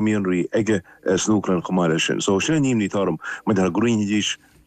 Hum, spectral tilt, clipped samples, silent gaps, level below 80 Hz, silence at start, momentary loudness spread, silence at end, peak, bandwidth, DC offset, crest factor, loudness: none; -5 dB/octave; under 0.1%; none; -54 dBFS; 0 s; 4 LU; 0.3 s; -8 dBFS; 9.8 kHz; under 0.1%; 12 dB; -21 LUFS